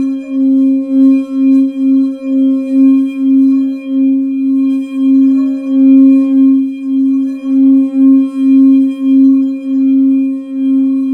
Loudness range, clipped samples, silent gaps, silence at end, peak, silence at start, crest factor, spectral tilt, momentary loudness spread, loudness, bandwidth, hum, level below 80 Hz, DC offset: 2 LU; under 0.1%; none; 0 s; 0 dBFS; 0 s; 10 dB; -7.5 dB/octave; 6 LU; -10 LUFS; 3.4 kHz; none; -66 dBFS; under 0.1%